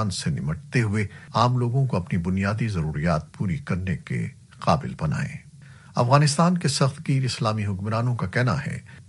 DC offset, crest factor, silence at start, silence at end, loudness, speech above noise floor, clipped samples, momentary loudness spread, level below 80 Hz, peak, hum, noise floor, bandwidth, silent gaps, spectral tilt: under 0.1%; 20 dB; 0 s; 0.05 s; -24 LUFS; 23 dB; under 0.1%; 9 LU; -48 dBFS; -4 dBFS; none; -46 dBFS; 11.5 kHz; none; -6 dB/octave